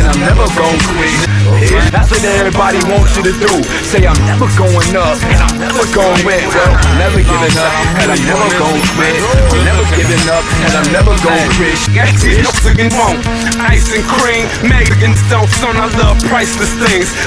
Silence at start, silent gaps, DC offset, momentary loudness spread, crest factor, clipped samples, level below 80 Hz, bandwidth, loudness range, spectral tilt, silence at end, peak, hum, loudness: 0 s; none; 0.3%; 2 LU; 10 dB; under 0.1%; -16 dBFS; 11 kHz; 1 LU; -4.5 dB/octave; 0 s; 0 dBFS; none; -10 LUFS